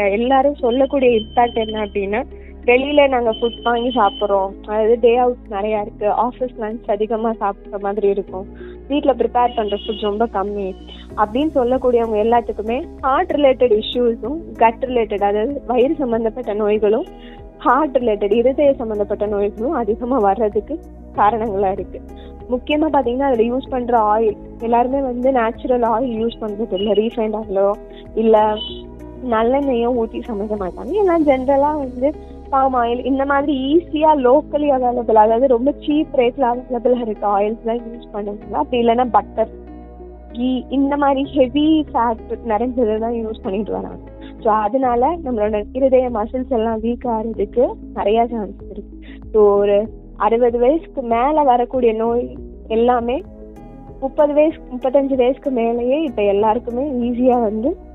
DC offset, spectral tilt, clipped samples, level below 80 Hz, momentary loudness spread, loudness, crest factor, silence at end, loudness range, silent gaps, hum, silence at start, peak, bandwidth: under 0.1%; -8 dB/octave; under 0.1%; -38 dBFS; 11 LU; -18 LUFS; 18 dB; 0 s; 4 LU; none; none; 0 s; 0 dBFS; 4.1 kHz